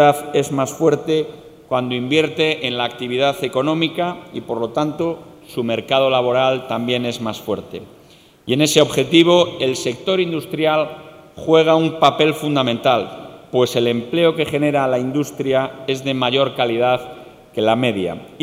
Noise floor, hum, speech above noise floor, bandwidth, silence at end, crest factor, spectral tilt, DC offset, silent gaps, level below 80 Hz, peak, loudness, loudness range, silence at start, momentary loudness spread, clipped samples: -48 dBFS; none; 30 dB; 16 kHz; 0 s; 18 dB; -5 dB/octave; under 0.1%; none; -58 dBFS; 0 dBFS; -18 LUFS; 3 LU; 0 s; 12 LU; under 0.1%